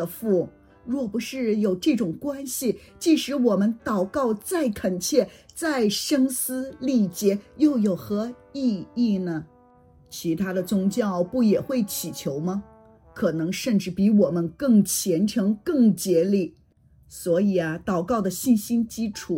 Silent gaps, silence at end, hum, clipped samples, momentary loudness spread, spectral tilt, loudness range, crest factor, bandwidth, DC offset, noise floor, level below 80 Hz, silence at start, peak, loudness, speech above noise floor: none; 0 s; none; under 0.1%; 9 LU; -5.5 dB/octave; 4 LU; 16 dB; 17 kHz; under 0.1%; -57 dBFS; -58 dBFS; 0 s; -6 dBFS; -24 LUFS; 34 dB